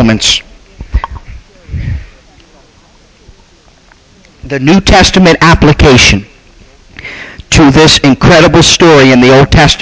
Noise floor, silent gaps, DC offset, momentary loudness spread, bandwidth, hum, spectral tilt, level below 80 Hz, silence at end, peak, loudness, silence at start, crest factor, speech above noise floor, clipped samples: -42 dBFS; none; under 0.1%; 20 LU; 8 kHz; none; -4.5 dB/octave; -20 dBFS; 0 s; 0 dBFS; -4 LUFS; 0 s; 8 dB; 37 dB; 0.3%